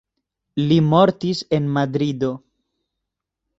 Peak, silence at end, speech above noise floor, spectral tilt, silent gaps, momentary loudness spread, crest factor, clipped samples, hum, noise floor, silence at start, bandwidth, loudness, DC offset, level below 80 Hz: -2 dBFS; 1.2 s; 64 dB; -7.5 dB/octave; none; 10 LU; 20 dB; under 0.1%; none; -82 dBFS; 0.55 s; 8 kHz; -19 LUFS; under 0.1%; -56 dBFS